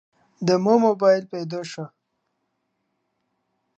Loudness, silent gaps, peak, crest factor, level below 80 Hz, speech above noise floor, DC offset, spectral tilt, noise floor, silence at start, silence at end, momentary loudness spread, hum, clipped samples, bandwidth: -21 LUFS; none; -4 dBFS; 20 dB; -72 dBFS; 55 dB; under 0.1%; -6.5 dB/octave; -75 dBFS; 0.4 s; 1.9 s; 17 LU; none; under 0.1%; 8.2 kHz